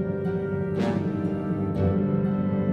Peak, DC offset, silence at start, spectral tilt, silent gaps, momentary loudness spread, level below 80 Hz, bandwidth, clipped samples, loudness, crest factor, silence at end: -12 dBFS; under 0.1%; 0 s; -10 dB/octave; none; 4 LU; -50 dBFS; 6.8 kHz; under 0.1%; -26 LUFS; 14 dB; 0 s